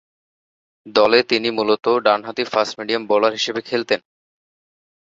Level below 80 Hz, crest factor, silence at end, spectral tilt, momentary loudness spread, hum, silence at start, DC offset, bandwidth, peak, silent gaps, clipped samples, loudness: -62 dBFS; 18 dB; 1.05 s; -3.5 dB/octave; 8 LU; none; 0.85 s; under 0.1%; 7.8 kHz; -2 dBFS; none; under 0.1%; -18 LUFS